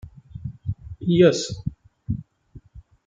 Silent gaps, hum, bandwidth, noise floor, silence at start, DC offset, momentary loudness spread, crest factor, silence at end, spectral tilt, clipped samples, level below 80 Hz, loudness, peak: none; none; 9.2 kHz; -49 dBFS; 0.05 s; under 0.1%; 20 LU; 20 dB; 0.25 s; -6 dB/octave; under 0.1%; -46 dBFS; -23 LUFS; -4 dBFS